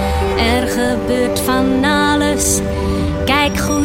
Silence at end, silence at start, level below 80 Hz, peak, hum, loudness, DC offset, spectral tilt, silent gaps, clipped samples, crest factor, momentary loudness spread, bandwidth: 0 s; 0 s; -26 dBFS; 0 dBFS; none; -15 LUFS; under 0.1%; -4 dB/octave; none; under 0.1%; 14 dB; 4 LU; 16.5 kHz